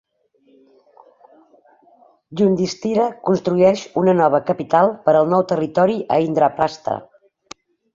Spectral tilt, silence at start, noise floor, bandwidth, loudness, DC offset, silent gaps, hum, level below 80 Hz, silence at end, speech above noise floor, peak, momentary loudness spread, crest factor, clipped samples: -7 dB/octave; 2.3 s; -59 dBFS; 7.6 kHz; -18 LUFS; under 0.1%; none; none; -58 dBFS; 0.9 s; 42 dB; -2 dBFS; 6 LU; 16 dB; under 0.1%